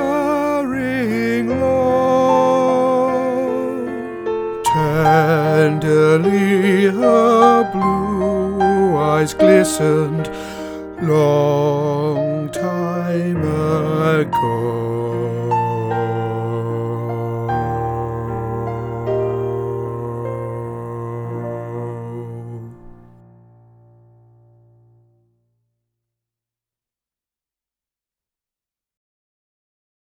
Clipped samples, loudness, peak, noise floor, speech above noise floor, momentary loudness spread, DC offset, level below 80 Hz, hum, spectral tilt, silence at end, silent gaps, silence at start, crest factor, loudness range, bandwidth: under 0.1%; -17 LUFS; 0 dBFS; under -90 dBFS; over 74 dB; 13 LU; under 0.1%; -46 dBFS; none; -6.5 dB/octave; 7 s; none; 0 s; 18 dB; 13 LU; 19.5 kHz